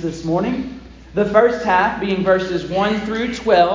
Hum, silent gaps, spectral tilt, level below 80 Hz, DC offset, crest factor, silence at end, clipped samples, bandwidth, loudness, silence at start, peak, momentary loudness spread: none; none; -6 dB/octave; -42 dBFS; under 0.1%; 16 dB; 0 s; under 0.1%; 7.6 kHz; -18 LUFS; 0 s; -2 dBFS; 10 LU